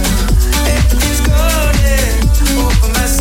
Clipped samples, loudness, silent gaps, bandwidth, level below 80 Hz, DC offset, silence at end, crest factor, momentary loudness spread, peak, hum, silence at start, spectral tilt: under 0.1%; -13 LUFS; none; 16.5 kHz; -12 dBFS; under 0.1%; 0 s; 10 dB; 1 LU; -2 dBFS; none; 0 s; -4 dB/octave